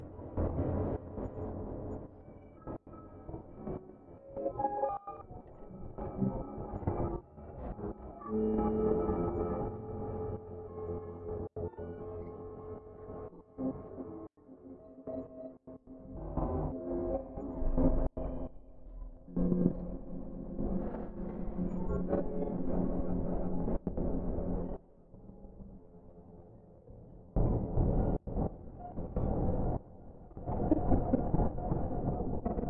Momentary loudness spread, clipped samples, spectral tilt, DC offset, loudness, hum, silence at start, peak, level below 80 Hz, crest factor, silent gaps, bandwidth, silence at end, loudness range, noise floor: 20 LU; under 0.1%; -13 dB/octave; under 0.1%; -37 LUFS; none; 0 s; -12 dBFS; -42 dBFS; 22 dB; none; 2.9 kHz; 0 s; 9 LU; -55 dBFS